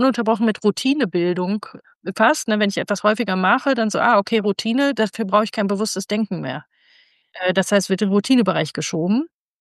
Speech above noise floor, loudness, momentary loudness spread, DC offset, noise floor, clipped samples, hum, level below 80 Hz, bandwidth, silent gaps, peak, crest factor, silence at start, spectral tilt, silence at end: 37 dB; -19 LUFS; 8 LU; under 0.1%; -56 dBFS; under 0.1%; none; -70 dBFS; 12.5 kHz; 1.96-2.01 s; -2 dBFS; 18 dB; 0 s; -5 dB/octave; 0.35 s